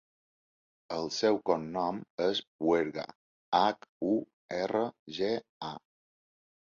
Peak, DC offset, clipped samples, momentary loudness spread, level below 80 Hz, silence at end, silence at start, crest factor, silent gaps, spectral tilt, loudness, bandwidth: -10 dBFS; under 0.1%; under 0.1%; 14 LU; -70 dBFS; 0.85 s; 0.9 s; 22 dB; 2.10-2.18 s, 2.47-2.59 s, 3.15-3.52 s, 3.89-4.01 s, 4.33-4.49 s, 4.99-5.06 s, 5.49-5.61 s; -5 dB/octave; -32 LUFS; 7.4 kHz